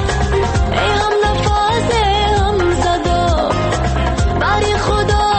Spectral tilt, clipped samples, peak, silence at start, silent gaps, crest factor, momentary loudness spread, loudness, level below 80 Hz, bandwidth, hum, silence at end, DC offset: -5 dB/octave; under 0.1%; -4 dBFS; 0 s; none; 10 dB; 2 LU; -15 LUFS; -22 dBFS; 8.8 kHz; none; 0 s; under 0.1%